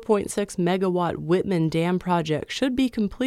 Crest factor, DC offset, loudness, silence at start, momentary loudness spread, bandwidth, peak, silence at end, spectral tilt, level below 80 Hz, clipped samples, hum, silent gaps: 14 dB; under 0.1%; -24 LUFS; 0 s; 3 LU; 14 kHz; -8 dBFS; 0 s; -6 dB/octave; -50 dBFS; under 0.1%; none; none